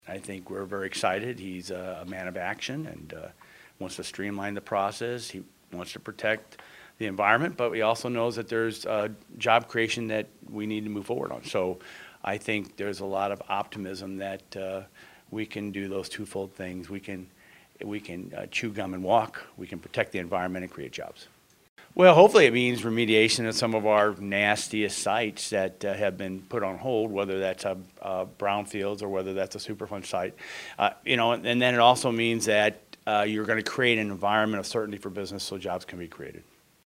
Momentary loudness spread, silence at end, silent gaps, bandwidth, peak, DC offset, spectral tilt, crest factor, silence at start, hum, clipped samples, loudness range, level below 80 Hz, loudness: 16 LU; 0.45 s; 21.69-21.76 s; 16 kHz; -2 dBFS; under 0.1%; -4 dB/octave; 26 dB; 0.05 s; none; under 0.1%; 13 LU; -68 dBFS; -27 LUFS